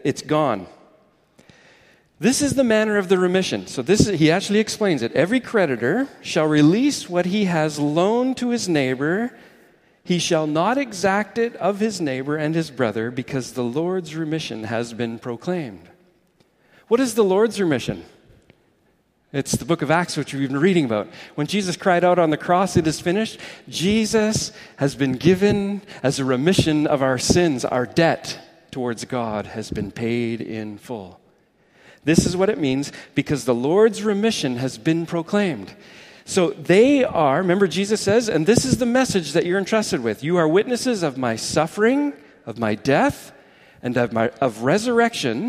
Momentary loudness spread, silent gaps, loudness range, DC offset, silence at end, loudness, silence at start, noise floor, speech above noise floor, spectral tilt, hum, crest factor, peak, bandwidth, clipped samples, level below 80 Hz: 10 LU; none; 6 LU; under 0.1%; 0 s; -20 LUFS; 0.05 s; -63 dBFS; 43 dB; -5 dB/octave; none; 20 dB; 0 dBFS; 15.5 kHz; under 0.1%; -50 dBFS